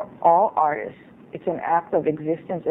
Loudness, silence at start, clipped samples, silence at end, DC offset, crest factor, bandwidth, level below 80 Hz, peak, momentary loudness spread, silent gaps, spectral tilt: -22 LUFS; 0 s; under 0.1%; 0 s; under 0.1%; 18 dB; 3.8 kHz; -64 dBFS; -4 dBFS; 13 LU; none; -10.5 dB/octave